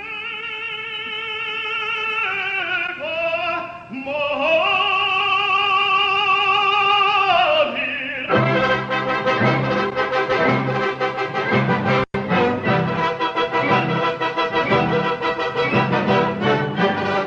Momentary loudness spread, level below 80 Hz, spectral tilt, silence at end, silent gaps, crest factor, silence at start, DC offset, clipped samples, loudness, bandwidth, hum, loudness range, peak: 8 LU; -54 dBFS; -6 dB/octave; 0 s; none; 16 dB; 0 s; under 0.1%; under 0.1%; -19 LUFS; 8.2 kHz; none; 6 LU; -4 dBFS